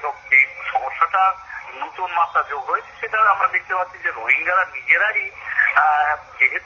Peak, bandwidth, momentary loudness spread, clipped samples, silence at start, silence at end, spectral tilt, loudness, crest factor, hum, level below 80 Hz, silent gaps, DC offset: -2 dBFS; 7.2 kHz; 9 LU; under 0.1%; 0 s; 0 s; 2 dB/octave; -18 LUFS; 16 dB; none; -60 dBFS; none; under 0.1%